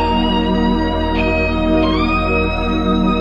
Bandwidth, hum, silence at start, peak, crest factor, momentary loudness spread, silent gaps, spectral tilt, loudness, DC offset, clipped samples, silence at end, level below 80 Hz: 8 kHz; none; 0 s; -2 dBFS; 12 dB; 2 LU; none; -7.5 dB/octave; -16 LUFS; 0.8%; under 0.1%; 0 s; -24 dBFS